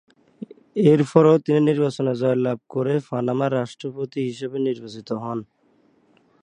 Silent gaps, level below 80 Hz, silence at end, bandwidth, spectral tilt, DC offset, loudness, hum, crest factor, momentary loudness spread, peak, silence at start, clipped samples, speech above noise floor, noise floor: none; -68 dBFS; 1 s; 10 kHz; -8 dB/octave; under 0.1%; -21 LUFS; none; 22 dB; 15 LU; 0 dBFS; 0.4 s; under 0.1%; 40 dB; -60 dBFS